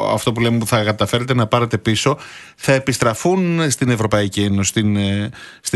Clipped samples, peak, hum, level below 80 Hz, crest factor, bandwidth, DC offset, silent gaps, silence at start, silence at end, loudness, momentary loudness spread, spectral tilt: under 0.1%; 0 dBFS; none; -48 dBFS; 16 dB; 12.5 kHz; under 0.1%; none; 0 s; 0 s; -17 LUFS; 6 LU; -5 dB/octave